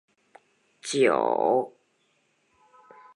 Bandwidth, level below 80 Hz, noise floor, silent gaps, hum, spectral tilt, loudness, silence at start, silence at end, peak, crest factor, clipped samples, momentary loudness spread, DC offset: 11.5 kHz; -82 dBFS; -70 dBFS; none; none; -4 dB/octave; -24 LUFS; 0.85 s; 1.45 s; -8 dBFS; 20 dB; under 0.1%; 16 LU; under 0.1%